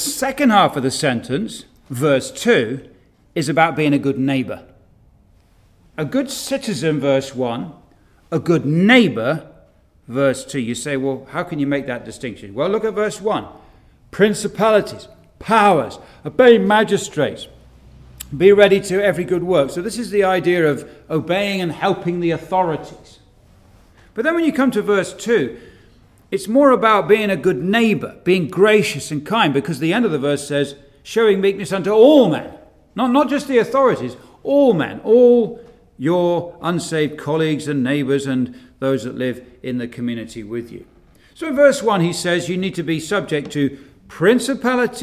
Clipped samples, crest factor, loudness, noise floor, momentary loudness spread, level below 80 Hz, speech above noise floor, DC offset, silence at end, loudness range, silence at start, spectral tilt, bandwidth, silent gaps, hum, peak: under 0.1%; 18 dB; -17 LUFS; -52 dBFS; 15 LU; -52 dBFS; 36 dB; under 0.1%; 0 s; 7 LU; 0 s; -5.5 dB/octave; 15.5 kHz; none; none; 0 dBFS